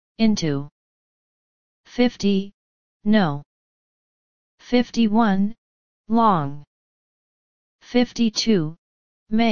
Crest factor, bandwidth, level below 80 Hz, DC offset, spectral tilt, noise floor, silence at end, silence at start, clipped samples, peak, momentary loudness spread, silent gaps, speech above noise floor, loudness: 18 dB; 7.2 kHz; -50 dBFS; 2%; -5.5 dB/octave; under -90 dBFS; 0 s; 0.15 s; under 0.1%; -4 dBFS; 13 LU; 0.71-1.84 s, 2.54-3.00 s, 3.46-4.58 s, 5.58-6.04 s, 6.67-7.79 s, 8.78-9.26 s; over 70 dB; -21 LUFS